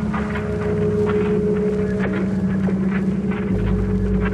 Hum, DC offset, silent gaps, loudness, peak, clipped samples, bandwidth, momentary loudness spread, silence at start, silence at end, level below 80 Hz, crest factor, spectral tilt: none; under 0.1%; none; -21 LUFS; -8 dBFS; under 0.1%; 8.4 kHz; 3 LU; 0 s; 0 s; -30 dBFS; 12 dB; -9 dB/octave